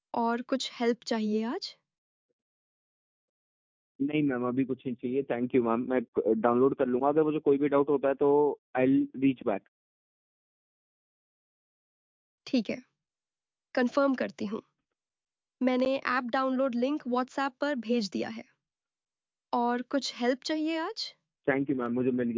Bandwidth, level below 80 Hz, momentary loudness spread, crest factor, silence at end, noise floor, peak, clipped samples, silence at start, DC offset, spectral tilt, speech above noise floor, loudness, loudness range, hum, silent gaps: 7.6 kHz; -72 dBFS; 9 LU; 18 dB; 0 s; under -90 dBFS; -12 dBFS; under 0.1%; 0.15 s; under 0.1%; -6 dB/octave; over 62 dB; -29 LUFS; 10 LU; none; 1.98-3.99 s, 6.08-6.13 s, 8.58-8.74 s, 9.68-12.38 s